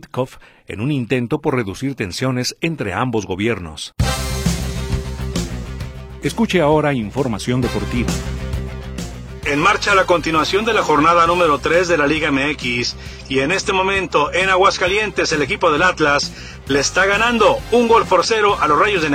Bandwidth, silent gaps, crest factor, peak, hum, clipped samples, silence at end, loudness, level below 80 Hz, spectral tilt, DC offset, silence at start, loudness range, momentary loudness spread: 17 kHz; none; 16 dB; -2 dBFS; none; under 0.1%; 0 s; -17 LUFS; -32 dBFS; -4.5 dB/octave; under 0.1%; 0.05 s; 6 LU; 12 LU